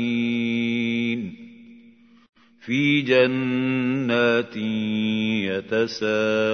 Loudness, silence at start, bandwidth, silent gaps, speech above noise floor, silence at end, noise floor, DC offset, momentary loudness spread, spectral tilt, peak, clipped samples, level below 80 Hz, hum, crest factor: -22 LUFS; 0 s; 6.6 kHz; 2.29-2.33 s; 30 dB; 0 s; -52 dBFS; under 0.1%; 8 LU; -6 dB/octave; -6 dBFS; under 0.1%; -66 dBFS; none; 18 dB